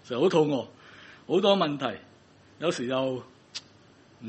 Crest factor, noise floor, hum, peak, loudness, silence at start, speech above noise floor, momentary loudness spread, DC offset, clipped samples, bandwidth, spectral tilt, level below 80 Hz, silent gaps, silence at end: 22 dB; -56 dBFS; none; -8 dBFS; -27 LUFS; 0.05 s; 30 dB; 20 LU; under 0.1%; under 0.1%; 8.4 kHz; -5.5 dB/octave; -72 dBFS; none; 0 s